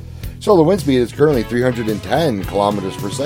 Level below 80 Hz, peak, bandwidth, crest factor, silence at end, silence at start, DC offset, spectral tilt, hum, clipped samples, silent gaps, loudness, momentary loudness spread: -36 dBFS; 0 dBFS; 17 kHz; 16 dB; 0 s; 0 s; under 0.1%; -6.5 dB/octave; none; under 0.1%; none; -16 LUFS; 10 LU